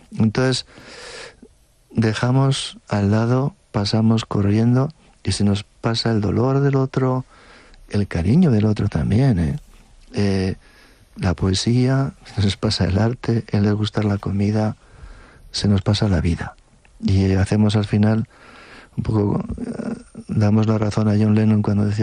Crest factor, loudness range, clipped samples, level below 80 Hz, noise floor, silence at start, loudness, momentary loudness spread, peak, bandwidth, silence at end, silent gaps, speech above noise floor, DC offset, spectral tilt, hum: 12 dB; 2 LU; under 0.1%; -40 dBFS; -51 dBFS; 0.1 s; -20 LUFS; 11 LU; -8 dBFS; 10.5 kHz; 0 s; none; 32 dB; under 0.1%; -7 dB/octave; none